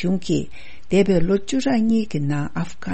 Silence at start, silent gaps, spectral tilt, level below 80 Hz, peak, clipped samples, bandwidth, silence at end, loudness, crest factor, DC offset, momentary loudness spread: 0 s; none; -6.5 dB/octave; -40 dBFS; -6 dBFS; under 0.1%; 8.8 kHz; 0 s; -21 LUFS; 16 dB; 4%; 9 LU